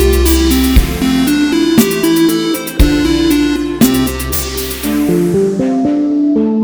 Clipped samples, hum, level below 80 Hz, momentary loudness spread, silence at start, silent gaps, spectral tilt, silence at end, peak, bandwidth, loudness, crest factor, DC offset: 0.2%; none; -20 dBFS; 5 LU; 0 s; none; -5 dB/octave; 0 s; 0 dBFS; over 20 kHz; -12 LUFS; 12 dB; under 0.1%